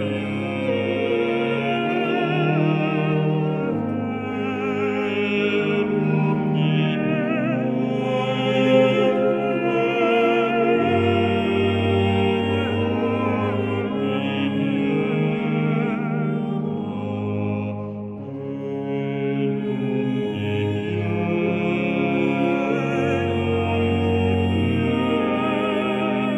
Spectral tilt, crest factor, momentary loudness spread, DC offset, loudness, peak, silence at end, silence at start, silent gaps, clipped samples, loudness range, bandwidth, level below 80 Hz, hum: -8 dB/octave; 16 dB; 6 LU; under 0.1%; -22 LUFS; -6 dBFS; 0 s; 0 s; none; under 0.1%; 6 LU; 8.4 kHz; -56 dBFS; none